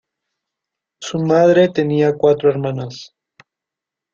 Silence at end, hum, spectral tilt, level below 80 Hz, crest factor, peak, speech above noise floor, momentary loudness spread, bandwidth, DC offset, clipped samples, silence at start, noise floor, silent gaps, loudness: 1.1 s; none; -6.5 dB/octave; -60 dBFS; 16 dB; -2 dBFS; 70 dB; 17 LU; 7.6 kHz; under 0.1%; under 0.1%; 1 s; -85 dBFS; none; -15 LUFS